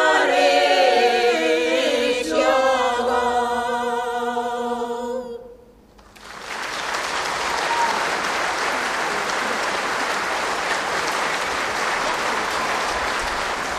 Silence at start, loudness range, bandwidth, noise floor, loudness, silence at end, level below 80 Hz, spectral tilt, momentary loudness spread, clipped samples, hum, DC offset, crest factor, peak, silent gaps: 0 s; 8 LU; 15 kHz; -48 dBFS; -21 LUFS; 0 s; -50 dBFS; -2 dB/octave; 9 LU; under 0.1%; none; under 0.1%; 16 dB; -4 dBFS; none